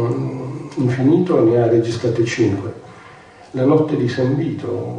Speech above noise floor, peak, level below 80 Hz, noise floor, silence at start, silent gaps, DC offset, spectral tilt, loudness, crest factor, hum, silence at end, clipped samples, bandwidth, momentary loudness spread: 25 dB; -4 dBFS; -54 dBFS; -42 dBFS; 0 s; none; under 0.1%; -7.5 dB/octave; -18 LUFS; 14 dB; none; 0 s; under 0.1%; 9.8 kHz; 13 LU